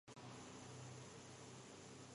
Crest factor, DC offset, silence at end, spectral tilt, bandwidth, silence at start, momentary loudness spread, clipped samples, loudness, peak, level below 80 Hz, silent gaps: 12 dB; under 0.1%; 0 s; -4 dB/octave; 11.5 kHz; 0.05 s; 2 LU; under 0.1%; -57 LUFS; -44 dBFS; -78 dBFS; none